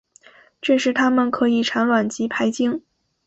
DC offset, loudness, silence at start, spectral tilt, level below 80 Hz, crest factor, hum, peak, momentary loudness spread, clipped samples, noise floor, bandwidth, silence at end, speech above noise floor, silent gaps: under 0.1%; -20 LUFS; 0.65 s; -4 dB/octave; -64 dBFS; 14 dB; none; -6 dBFS; 6 LU; under 0.1%; -51 dBFS; 8 kHz; 0.5 s; 32 dB; none